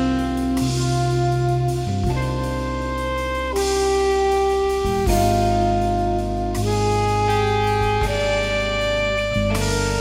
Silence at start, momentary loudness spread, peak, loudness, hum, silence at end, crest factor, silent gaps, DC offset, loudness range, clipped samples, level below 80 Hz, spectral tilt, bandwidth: 0 s; 5 LU; -6 dBFS; -20 LUFS; none; 0 s; 14 dB; none; under 0.1%; 2 LU; under 0.1%; -30 dBFS; -5.5 dB/octave; 16 kHz